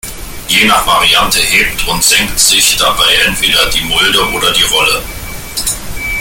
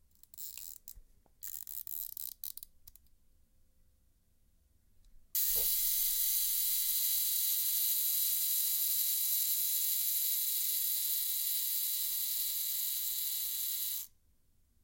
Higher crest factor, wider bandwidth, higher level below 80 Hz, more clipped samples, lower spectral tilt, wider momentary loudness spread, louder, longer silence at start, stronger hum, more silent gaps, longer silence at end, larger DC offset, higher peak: second, 12 dB vs 20 dB; first, over 20 kHz vs 17 kHz; first, -28 dBFS vs -66 dBFS; neither; first, -0.5 dB/octave vs 3.5 dB/octave; second, 10 LU vs 14 LU; first, -8 LUFS vs -30 LUFS; second, 0.05 s vs 0.35 s; neither; neither; second, 0 s vs 0.75 s; neither; first, 0 dBFS vs -16 dBFS